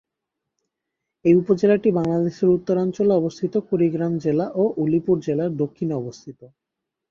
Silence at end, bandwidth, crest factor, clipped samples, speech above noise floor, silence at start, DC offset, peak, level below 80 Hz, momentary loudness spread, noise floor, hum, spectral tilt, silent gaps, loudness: 0.65 s; 7.2 kHz; 16 dB; under 0.1%; 63 dB; 1.25 s; under 0.1%; -4 dBFS; -58 dBFS; 8 LU; -83 dBFS; none; -9 dB/octave; none; -21 LUFS